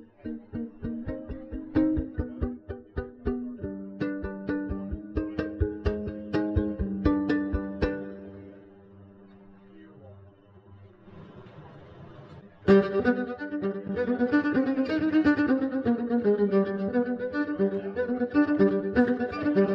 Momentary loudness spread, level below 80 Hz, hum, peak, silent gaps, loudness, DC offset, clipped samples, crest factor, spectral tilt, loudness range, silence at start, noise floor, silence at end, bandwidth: 17 LU; -42 dBFS; none; -8 dBFS; none; -28 LUFS; under 0.1%; under 0.1%; 20 dB; -9.5 dB/octave; 9 LU; 0 s; -53 dBFS; 0 s; 6 kHz